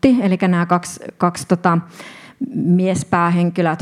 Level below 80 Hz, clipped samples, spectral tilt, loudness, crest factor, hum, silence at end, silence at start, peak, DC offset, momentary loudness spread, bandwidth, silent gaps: -52 dBFS; under 0.1%; -6.5 dB/octave; -17 LUFS; 16 dB; none; 0 s; 0.05 s; 0 dBFS; under 0.1%; 14 LU; 13 kHz; none